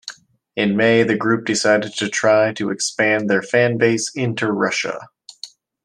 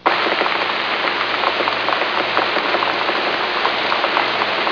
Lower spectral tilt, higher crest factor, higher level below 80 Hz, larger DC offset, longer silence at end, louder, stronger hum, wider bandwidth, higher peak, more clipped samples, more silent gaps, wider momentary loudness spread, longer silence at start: about the same, -4 dB/octave vs -3.5 dB/octave; about the same, 16 dB vs 18 dB; second, -62 dBFS vs -56 dBFS; neither; first, 0.4 s vs 0 s; about the same, -18 LUFS vs -17 LUFS; neither; first, 12 kHz vs 5.4 kHz; about the same, -2 dBFS vs -2 dBFS; neither; neither; first, 16 LU vs 1 LU; about the same, 0.05 s vs 0 s